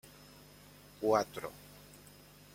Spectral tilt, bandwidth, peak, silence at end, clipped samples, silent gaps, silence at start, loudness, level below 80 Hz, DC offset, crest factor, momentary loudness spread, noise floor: -5 dB/octave; 16.5 kHz; -16 dBFS; 0.6 s; under 0.1%; none; 1 s; -35 LUFS; -68 dBFS; under 0.1%; 24 dB; 25 LU; -57 dBFS